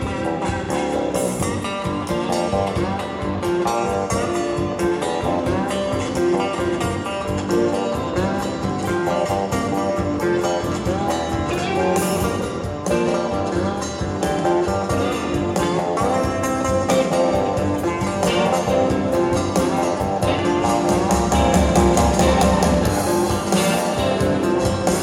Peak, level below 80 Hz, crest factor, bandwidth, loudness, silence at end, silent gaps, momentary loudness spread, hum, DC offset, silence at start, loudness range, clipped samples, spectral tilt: -4 dBFS; -34 dBFS; 16 dB; 16.5 kHz; -20 LUFS; 0 s; none; 6 LU; none; under 0.1%; 0 s; 4 LU; under 0.1%; -5.5 dB/octave